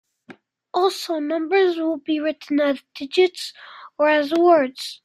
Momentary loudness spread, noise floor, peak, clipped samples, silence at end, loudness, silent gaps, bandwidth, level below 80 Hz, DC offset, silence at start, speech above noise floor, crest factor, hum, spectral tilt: 12 LU; -48 dBFS; -4 dBFS; under 0.1%; 0.1 s; -20 LUFS; none; 15 kHz; -74 dBFS; under 0.1%; 0.3 s; 28 dB; 16 dB; none; -3 dB/octave